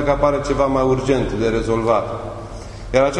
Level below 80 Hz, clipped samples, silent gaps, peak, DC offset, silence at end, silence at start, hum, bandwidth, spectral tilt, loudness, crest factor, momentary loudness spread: -32 dBFS; under 0.1%; none; -2 dBFS; under 0.1%; 0 s; 0 s; none; 11 kHz; -6.5 dB/octave; -19 LUFS; 16 dB; 14 LU